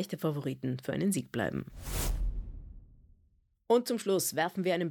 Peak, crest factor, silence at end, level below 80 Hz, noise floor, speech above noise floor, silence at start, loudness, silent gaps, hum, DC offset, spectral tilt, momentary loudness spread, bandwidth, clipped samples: -14 dBFS; 18 dB; 0 s; -42 dBFS; -69 dBFS; 38 dB; 0 s; -32 LUFS; none; none; under 0.1%; -5 dB/octave; 11 LU; over 20 kHz; under 0.1%